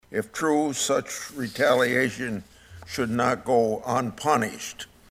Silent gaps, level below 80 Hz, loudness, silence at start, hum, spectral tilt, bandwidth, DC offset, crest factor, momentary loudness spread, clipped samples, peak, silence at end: none; -58 dBFS; -25 LUFS; 0.1 s; none; -4 dB/octave; 16 kHz; under 0.1%; 18 dB; 13 LU; under 0.1%; -6 dBFS; 0.25 s